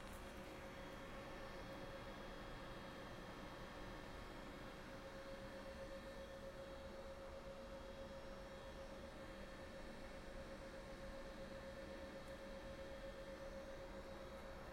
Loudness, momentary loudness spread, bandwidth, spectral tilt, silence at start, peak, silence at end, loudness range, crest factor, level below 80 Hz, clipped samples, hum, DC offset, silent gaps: -54 LUFS; 2 LU; 16 kHz; -5 dB/octave; 0 s; -40 dBFS; 0 s; 1 LU; 14 dB; -60 dBFS; under 0.1%; none; under 0.1%; none